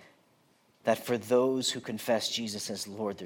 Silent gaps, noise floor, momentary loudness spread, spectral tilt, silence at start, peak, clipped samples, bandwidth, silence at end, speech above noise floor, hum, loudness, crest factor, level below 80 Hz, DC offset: none; -67 dBFS; 9 LU; -3.5 dB/octave; 0 s; -12 dBFS; under 0.1%; 17 kHz; 0 s; 36 dB; none; -30 LUFS; 20 dB; -80 dBFS; under 0.1%